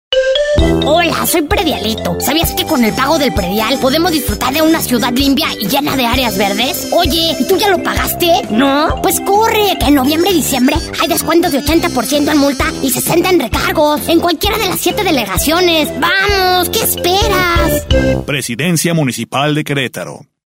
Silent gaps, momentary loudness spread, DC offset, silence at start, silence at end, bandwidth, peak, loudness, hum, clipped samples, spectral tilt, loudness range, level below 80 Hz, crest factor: none; 4 LU; under 0.1%; 0.1 s; 0.25 s; 16.5 kHz; 0 dBFS; -12 LUFS; none; under 0.1%; -4 dB/octave; 1 LU; -26 dBFS; 12 dB